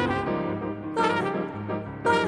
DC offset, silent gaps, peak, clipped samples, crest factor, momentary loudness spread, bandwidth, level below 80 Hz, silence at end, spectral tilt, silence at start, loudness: under 0.1%; none; -10 dBFS; under 0.1%; 18 dB; 7 LU; 11.5 kHz; -52 dBFS; 0 s; -6 dB/octave; 0 s; -28 LUFS